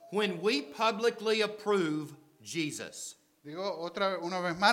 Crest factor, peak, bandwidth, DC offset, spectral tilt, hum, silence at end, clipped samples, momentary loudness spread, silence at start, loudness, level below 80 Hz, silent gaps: 22 dB; -10 dBFS; 16.5 kHz; under 0.1%; -4 dB/octave; none; 0 s; under 0.1%; 15 LU; 0 s; -32 LUFS; -78 dBFS; none